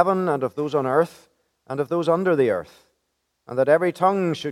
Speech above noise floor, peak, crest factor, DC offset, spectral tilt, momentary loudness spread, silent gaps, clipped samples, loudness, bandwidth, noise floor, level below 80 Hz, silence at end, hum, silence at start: 53 dB; -2 dBFS; 20 dB; under 0.1%; -7 dB/octave; 9 LU; none; under 0.1%; -22 LUFS; 14 kHz; -74 dBFS; -68 dBFS; 0 s; none; 0 s